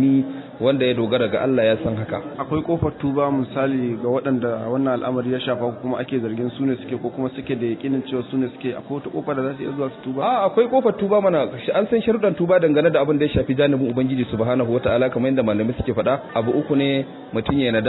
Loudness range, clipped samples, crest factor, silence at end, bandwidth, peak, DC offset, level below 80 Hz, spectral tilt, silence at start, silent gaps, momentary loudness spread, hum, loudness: 6 LU; under 0.1%; 14 dB; 0 s; 4.1 kHz; -6 dBFS; under 0.1%; -48 dBFS; -11 dB/octave; 0 s; none; 8 LU; none; -21 LUFS